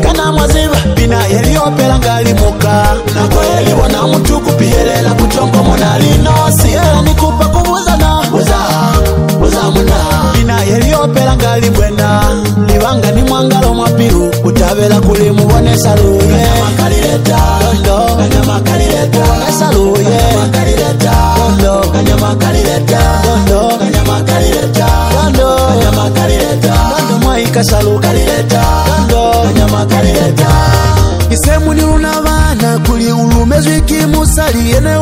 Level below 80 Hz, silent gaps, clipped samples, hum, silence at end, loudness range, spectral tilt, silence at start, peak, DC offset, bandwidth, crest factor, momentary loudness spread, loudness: -16 dBFS; none; under 0.1%; none; 0 s; 1 LU; -5.5 dB/octave; 0 s; 0 dBFS; under 0.1%; 16.5 kHz; 8 dB; 2 LU; -9 LUFS